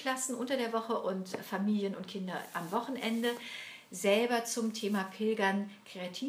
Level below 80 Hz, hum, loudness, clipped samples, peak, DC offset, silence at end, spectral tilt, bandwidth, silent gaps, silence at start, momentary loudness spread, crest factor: under -90 dBFS; none; -34 LUFS; under 0.1%; -14 dBFS; under 0.1%; 0 s; -4 dB/octave; 16 kHz; none; 0 s; 11 LU; 20 dB